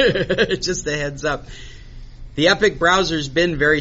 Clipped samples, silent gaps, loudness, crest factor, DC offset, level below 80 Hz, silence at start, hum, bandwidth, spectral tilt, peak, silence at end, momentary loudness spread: under 0.1%; none; -18 LUFS; 16 dB; under 0.1%; -36 dBFS; 0 s; none; 8 kHz; -2.5 dB/octave; -2 dBFS; 0 s; 13 LU